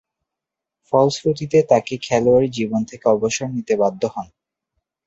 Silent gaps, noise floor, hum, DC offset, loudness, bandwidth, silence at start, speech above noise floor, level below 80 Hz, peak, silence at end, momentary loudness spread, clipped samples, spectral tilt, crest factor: none; -85 dBFS; none; under 0.1%; -19 LUFS; 8 kHz; 0.9 s; 67 dB; -56 dBFS; -2 dBFS; 0.85 s; 8 LU; under 0.1%; -5.5 dB/octave; 18 dB